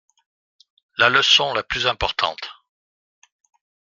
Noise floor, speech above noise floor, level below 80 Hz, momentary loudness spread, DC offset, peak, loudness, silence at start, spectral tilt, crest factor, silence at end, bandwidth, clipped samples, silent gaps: under -90 dBFS; over 71 dB; -48 dBFS; 18 LU; under 0.1%; 0 dBFS; -18 LUFS; 1 s; -1.5 dB/octave; 22 dB; 1.35 s; 13.5 kHz; under 0.1%; none